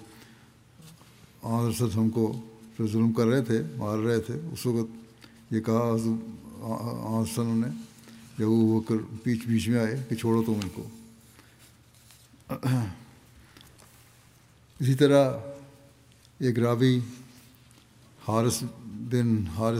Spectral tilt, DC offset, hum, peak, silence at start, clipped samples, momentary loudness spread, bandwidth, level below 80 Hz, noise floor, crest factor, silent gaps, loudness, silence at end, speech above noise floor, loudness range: -7 dB/octave; under 0.1%; none; -8 dBFS; 0 s; under 0.1%; 17 LU; 16 kHz; -64 dBFS; -57 dBFS; 20 dB; none; -27 LUFS; 0 s; 31 dB; 7 LU